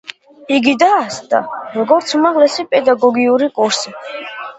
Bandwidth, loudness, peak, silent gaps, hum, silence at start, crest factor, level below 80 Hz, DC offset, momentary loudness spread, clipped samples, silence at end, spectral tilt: 8.2 kHz; -14 LUFS; 0 dBFS; none; none; 0.1 s; 14 dB; -62 dBFS; under 0.1%; 13 LU; under 0.1%; 0.05 s; -3 dB/octave